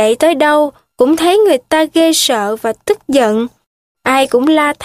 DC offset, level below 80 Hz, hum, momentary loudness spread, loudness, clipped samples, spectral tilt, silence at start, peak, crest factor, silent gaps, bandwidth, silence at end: under 0.1%; -54 dBFS; none; 8 LU; -12 LUFS; under 0.1%; -2.5 dB/octave; 0 s; 0 dBFS; 12 dB; 3.66-3.95 s; 15.5 kHz; 0 s